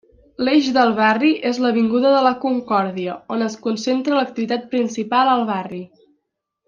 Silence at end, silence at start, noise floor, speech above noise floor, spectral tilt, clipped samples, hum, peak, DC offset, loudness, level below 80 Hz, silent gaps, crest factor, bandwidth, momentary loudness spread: 0.8 s; 0.4 s; -76 dBFS; 58 dB; -5 dB/octave; under 0.1%; none; -2 dBFS; under 0.1%; -18 LUFS; -64 dBFS; none; 16 dB; 7.4 kHz; 9 LU